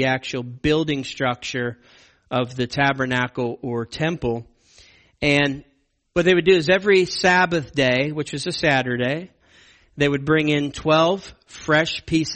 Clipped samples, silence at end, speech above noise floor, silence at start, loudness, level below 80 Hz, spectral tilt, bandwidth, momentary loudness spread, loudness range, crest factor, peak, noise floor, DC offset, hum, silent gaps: under 0.1%; 0 s; 33 dB; 0 s; -21 LUFS; -48 dBFS; -5 dB/octave; 8.8 kHz; 11 LU; 6 LU; 18 dB; -4 dBFS; -53 dBFS; under 0.1%; none; none